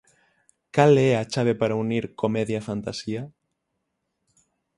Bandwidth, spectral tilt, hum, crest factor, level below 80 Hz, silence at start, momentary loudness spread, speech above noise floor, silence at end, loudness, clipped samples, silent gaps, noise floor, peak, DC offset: 11.5 kHz; -6.5 dB/octave; none; 20 dB; -60 dBFS; 0.75 s; 14 LU; 56 dB; 1.5 s; -23 LUFS; under 0.1%; none; -78 dBFS; -6 dBFS; under 0.1%